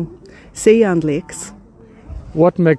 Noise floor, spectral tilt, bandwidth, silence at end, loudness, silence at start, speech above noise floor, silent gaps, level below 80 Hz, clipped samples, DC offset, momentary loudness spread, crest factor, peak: -42 dBFS; -6.5 dB/octave; 11 kHz; 0 s; -15 LUFS; 0 s; 27 dB; none; -40 dBFS; under 0.1%; under 0.1%; 22 LU; 16 dB; 0 dBFS